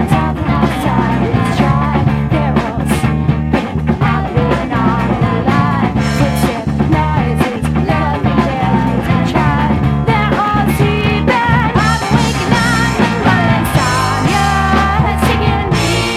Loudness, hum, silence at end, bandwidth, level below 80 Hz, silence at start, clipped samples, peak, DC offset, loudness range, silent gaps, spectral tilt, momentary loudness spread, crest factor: -13 LUFS; none; 0 s; 15.5 kHz; -24 dBFS; 0 s; under 0.1%; 0 dBFS; under 0.1%; 2 LU; none; -6 dB/octave; 3 LU; 12 dB